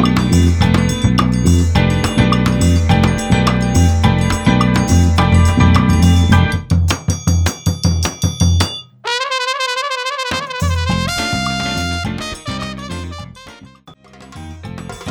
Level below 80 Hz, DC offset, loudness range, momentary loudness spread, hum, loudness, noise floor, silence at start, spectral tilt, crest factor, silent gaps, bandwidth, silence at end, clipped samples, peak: -24 dBFS; under 0.1%; 8 LU; 13 LU; none; -15 LUFS; -42 dBFS; 0 s; -5.5 dB/octave; 14 dB; none; 17 kHz; 0 s; under 0.1%; 0 dBFS